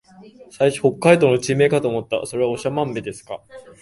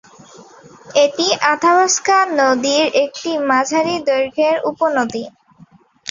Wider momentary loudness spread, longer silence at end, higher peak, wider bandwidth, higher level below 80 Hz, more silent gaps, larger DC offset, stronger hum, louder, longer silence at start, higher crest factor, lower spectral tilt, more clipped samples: first, 16 LU vs 7 LU; first, 0.2 s vs 0 s; about the same, 0 dBFS vs 0 dBFS; first, 11.5 kHz vs 7.6 kHz; about the same, -58 dBFS vs -62 dBFS; neither; neither; neither; second, -19 LUFS vs -15 LUFS; second, 0.2 s vs 0.4 s; about the same, 20 dB vs 16 dB; first, -5.5 dB/octave vs -2 dB/octave; neither